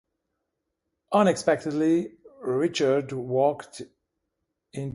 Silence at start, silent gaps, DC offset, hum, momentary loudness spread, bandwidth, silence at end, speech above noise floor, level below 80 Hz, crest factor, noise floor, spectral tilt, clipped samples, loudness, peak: 1.1 s; none; under 0.1%; none; 17 LU; 11.5 kHz; 0.05 s; 57 dB; -68 dBFS; 20 dB; -81 dBFS; -5.5 dB/octave; under 0.1%; -25 LUFS; -8 dBFS